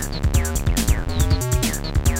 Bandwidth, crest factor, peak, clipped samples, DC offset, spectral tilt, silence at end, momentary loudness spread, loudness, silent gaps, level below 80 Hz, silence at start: 17 kHz; 14 dB; -6 dBFS; under 0.1%; under 0.1%; -4.5 dB/octave; 0 s; 2 LU; -21 LUFS; none; -22 dBFS; 0 s